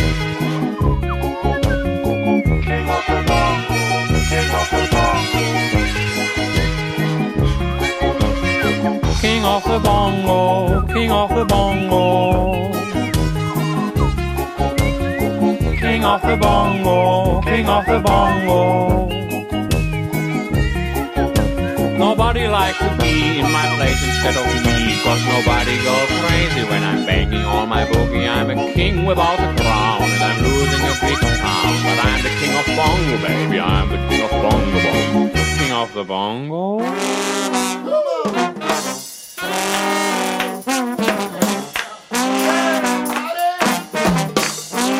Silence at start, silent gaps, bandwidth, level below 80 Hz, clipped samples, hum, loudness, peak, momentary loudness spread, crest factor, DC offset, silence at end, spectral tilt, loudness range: 0 s; none; 16 kHz; -26 dBFS; under 0.1%; none; -17 LUFS; -4 dBFS; 5 LU; 14 dB; under 0.1%; 0 s; -5 dB/octave; 4 LU